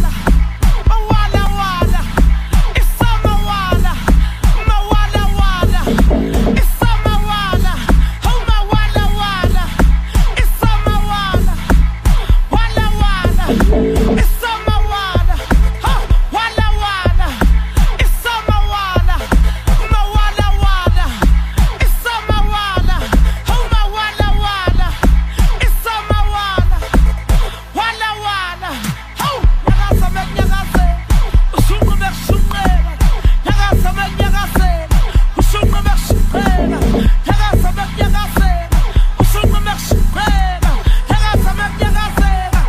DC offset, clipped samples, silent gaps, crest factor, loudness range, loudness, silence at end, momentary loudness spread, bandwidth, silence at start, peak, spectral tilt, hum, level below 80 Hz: under 0.1%; under 0.1%; none; 12 dB; 1 LU; -15 LUFS; 0 s; 3 LU; 15.5 kHz; 0 s; 0 dBFS; -5.5 dB/octave; none; -12 dBFS